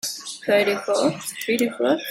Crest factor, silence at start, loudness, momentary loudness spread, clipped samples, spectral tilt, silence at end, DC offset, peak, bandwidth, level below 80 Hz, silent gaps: 16 dB; 0.05 s; -22 LUFS; 9 LU; under 0.1%; -3.5 dB/octave; 0 s; under 0.1%; -6 dBFS; 16.5 kHz; -68 dBFS; none